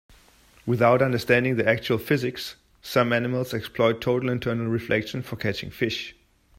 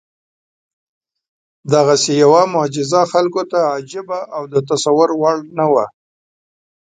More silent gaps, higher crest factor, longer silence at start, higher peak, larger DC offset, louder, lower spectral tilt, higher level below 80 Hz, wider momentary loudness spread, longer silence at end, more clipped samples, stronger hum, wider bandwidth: neither; about the same, 20 dB vs 16 dB; second, 0.65 s vs 1.65 s; second, -6 dBFS vs 0 dBFS; neither; second, -24 LUFS vs -15 LUFS; first, -6 dB/octave vs -4.5 dB/octave; first, -56 dBFS vs -62 dBFS; about the same, 12 LU vs 13 LU; second, 0.45 s vs 1 s; neither; neither; first, 16 kHz vs 9.4 kHz